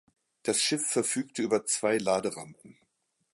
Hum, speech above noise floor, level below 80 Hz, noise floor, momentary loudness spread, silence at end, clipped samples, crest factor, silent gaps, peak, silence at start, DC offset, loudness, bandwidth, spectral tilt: none; 47 dB; -72 dBFS; -77 dBFS; 10 LU; 0.65 s; under 0.1%; 18 dB; none; -12 dBFS; 0.45 s; under 0.1%; -28 LUFS; 12 kHz; -2.5 dB/octave